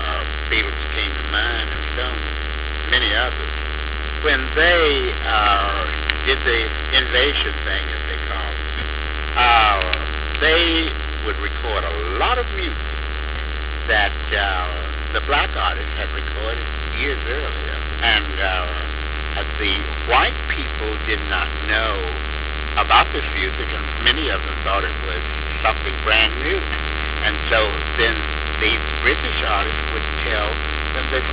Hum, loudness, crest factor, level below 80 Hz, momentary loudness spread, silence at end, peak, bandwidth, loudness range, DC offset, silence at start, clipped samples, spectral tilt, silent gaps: none; -19 LUFS; 18 dB; -26 dBFS; 10 LU; 0 s; -2 dBFS; 4 kHz; 4 LU; 0.6%; 0 s; under 0.1%; -8 dB/octave; none